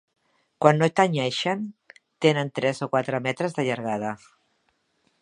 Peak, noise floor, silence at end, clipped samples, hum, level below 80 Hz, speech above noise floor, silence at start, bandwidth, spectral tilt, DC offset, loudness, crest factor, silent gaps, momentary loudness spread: -2 dBFS; -70 dBFS; 1.05 s; under 0.1%; none; -70 dBFS; 47 dB; 0.6 s; 11 kHz; -5.5 dB/octave; under 0.1%; -24 LUFS; 24 dB; none; 10 LU